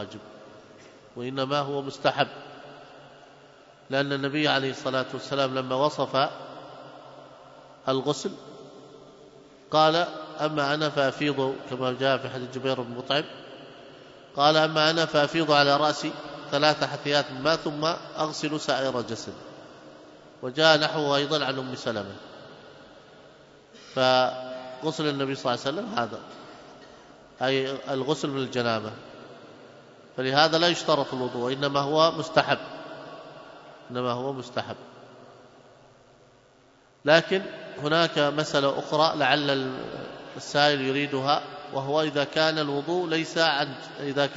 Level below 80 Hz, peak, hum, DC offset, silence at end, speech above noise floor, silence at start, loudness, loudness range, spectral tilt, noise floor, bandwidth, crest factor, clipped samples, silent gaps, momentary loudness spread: -68 dBFS; -4 dBFS; none; under 0.1%; 0 s; 33 dB; 0 s; -25 LUFS; 7 LU; -4.5 dB/octave; -58 dBFS; 8 kHz; 22 dB; under 0.1%; none; 22 LU